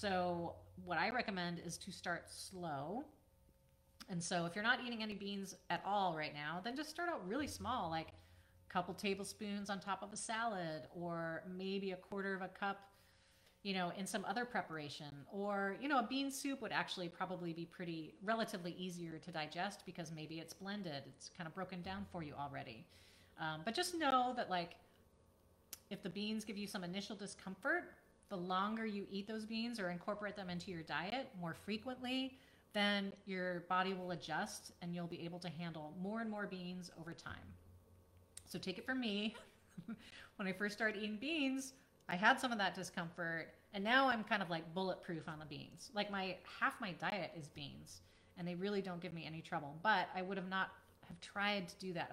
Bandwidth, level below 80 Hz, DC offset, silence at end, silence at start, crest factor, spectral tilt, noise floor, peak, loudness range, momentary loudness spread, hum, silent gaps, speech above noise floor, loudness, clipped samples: 16 kHz; -76 dBFS; under 0.1%; 0 s; 0 s; 26 dB; -4.5 dB/octave; -72 dBFS; -18 dBFS; 7 LU; 13 LU; none; none; 29 dB; -42 LUFS; under 0.1%